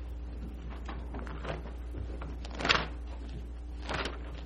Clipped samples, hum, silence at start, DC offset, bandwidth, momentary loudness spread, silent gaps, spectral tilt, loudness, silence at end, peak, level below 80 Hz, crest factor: under 0.1%; none; 0 s; under 0.1%; 10.5 kHz; 15 LU; none; -4.5 dB/octave; -37 LUFS; 0 s; -8 dBFS; -40 dBFS; 30 dB